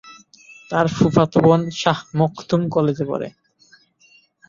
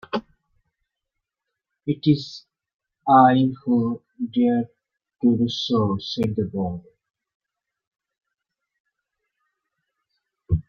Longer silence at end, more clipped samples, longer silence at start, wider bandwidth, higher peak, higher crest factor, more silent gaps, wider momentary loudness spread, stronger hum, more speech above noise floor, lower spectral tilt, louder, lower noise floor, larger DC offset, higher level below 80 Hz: first, 1.2 s vs 0.1 s; neither; about the same, 0.05 s vs 0.15 s; about the same, 7.6 kHz vs 7 kHz; about the same, -2 dBFS vs -2 dBFS; about the same, 18 dB vs 22 dB; second, none vs 2.74-2.79 s, 7.35-7.40 s, 7.87-7.91 s, 8.80-8.85 s; second, 10 LU vs 15 LU; neither; second, 37 dB vs 64 dB; about the same, -7 dB/octave vs -7.5 dB/octave; first, -19 LUFS vs -22 LUFS; second, -55 dBFS vs -84 dBFS; neither; about the same, -52 dBFS vs -48 dBFS